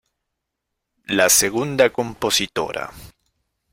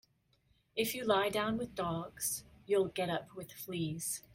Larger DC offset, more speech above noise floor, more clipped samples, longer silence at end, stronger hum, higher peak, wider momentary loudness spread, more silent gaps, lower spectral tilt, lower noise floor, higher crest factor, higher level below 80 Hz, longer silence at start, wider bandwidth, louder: neither; first, 60 dB vs 38 dB; neither; first, 0.65 s vs 0.15 s; neither; first, -2 dBFS vs -16 dBFS; about the same, 13 LU vs 11 LU; neither; second, -2 dB/octave vs -3.5 dB/octave; first, -80 dBFS vs -73 dBFS; about the same, 20 dB vs 20 dB; first, -52 dBFS vs -66 dBFS; first, 1.1 s vs 0.75 s; about the same, 16.5 kHz vs 16.5 kHz; first, -18 LUFS vs -36 LUFS